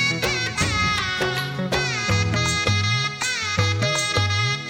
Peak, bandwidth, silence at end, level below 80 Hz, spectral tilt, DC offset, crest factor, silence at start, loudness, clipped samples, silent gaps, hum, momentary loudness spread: -6 dBFS; 16.5 kHz; 0 s; -42 dBFS; -3.5 dB/octave; under 0.1%; 16 dB; 0 s; -21 LUFS; under 0.1%; none; none; 3 LU